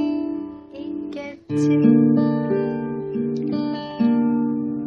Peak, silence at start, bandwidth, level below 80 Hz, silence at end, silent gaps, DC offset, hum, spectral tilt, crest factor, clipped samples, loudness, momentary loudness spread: -4 dBFS; 0 s; 7.6 kHz; -60 dBFS; 0 s; none; under 0.1%; none; -8.5 dB/octave; 16 dB; under 0.1%; -21 LUFS; 16 LU